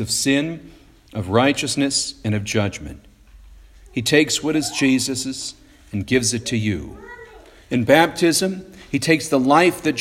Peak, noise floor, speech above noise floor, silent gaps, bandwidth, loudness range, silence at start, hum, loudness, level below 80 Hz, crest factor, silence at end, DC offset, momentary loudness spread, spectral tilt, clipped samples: 0 dBFS; -45 dBFS; 26 dB; none; 16.5 kHz; 4 LU; 0 s; none; -19 LUFS; -48 dBFS; 20 dB; 0 s; under 0.1%; 17 LU; -4 dB/octave; under 0.1%